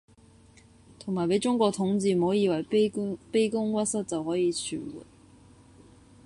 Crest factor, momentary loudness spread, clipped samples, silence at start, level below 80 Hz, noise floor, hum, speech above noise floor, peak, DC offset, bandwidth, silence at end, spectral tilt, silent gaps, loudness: 18 dB; 10 LU; under 0.1%; 1 s; -62 dBFS; -56 dBFS; none; 29 dB; -10 dBFS; under 0.1%; 11.5 kHz; 1.25 s; -5.5 dB/octave; none; -27 LUFS